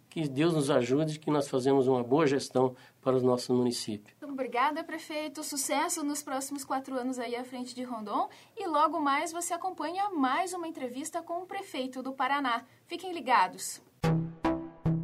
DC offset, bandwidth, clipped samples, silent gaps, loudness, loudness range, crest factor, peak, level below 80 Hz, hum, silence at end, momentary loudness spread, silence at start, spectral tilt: under 0.1%; 16 kHz; under 0.1%; none; -31 LUFS; 5 LU; 20 dB; -10 dBFS; -60 dBFS; none; 0 s; 11 LU; 0.1 s; -5 dB/octave